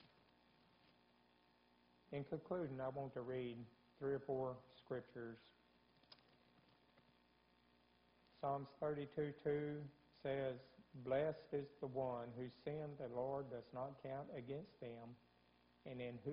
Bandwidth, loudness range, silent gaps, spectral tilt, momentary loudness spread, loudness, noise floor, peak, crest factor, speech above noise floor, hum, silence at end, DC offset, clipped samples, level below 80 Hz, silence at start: 5.2 kHz; 7 LU; none; -6.5 dB/octave; 14 LU; -48 LUFS; -76 dBFS; -30 dBFS; 20 dB; 29 dB; none; 0 s; under 0.1%; under 0.1%; -78 dBFS; 0 s